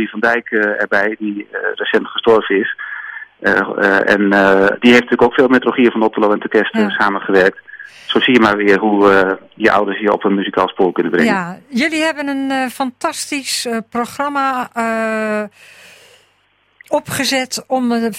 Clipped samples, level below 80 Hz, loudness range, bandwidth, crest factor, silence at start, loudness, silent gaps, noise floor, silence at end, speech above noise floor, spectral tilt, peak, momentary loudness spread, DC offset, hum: under 0.1%; -52 dBFS; 8 LU; 16 kHz; 14 dB; 0 s; -14 LUFS; none; -58 dBFS; 0 s; 43 dB; -4 dB/octave; 0 dBFS; 10 LU; under 0.1%; none